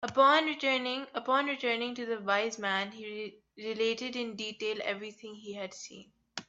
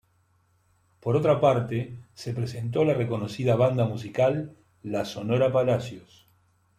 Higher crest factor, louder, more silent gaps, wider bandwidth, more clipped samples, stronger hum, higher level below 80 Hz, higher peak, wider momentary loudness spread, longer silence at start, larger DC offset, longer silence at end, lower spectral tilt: about the same, 20 dB vs 18 dB; second, -31 LUFS vs -26 LUFS; neither; second, 8.2 kHz vs 13 kHz; neither; neither; second, -78 dBFS vs -62 dBFS; second, -12 dBFS vs -8 dBFS; about the same, 17 LU vs 16 LU; second, 0 s vs 1.05 s; neither; second, 0.05 s vs 0.8 s; second, -3 dB/octave vs -7.5 dB/octave